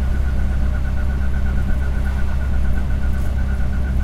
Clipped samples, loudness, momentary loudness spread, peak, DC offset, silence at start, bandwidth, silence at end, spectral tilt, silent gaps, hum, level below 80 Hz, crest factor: under 0.1%; -22 LUFS; 1 LU; -6 dBFS; under 0.1%; 0 s; 7.6 kHz; 0 s; -7.5 dB/octave; none; none; -18 dBFS; 10 dB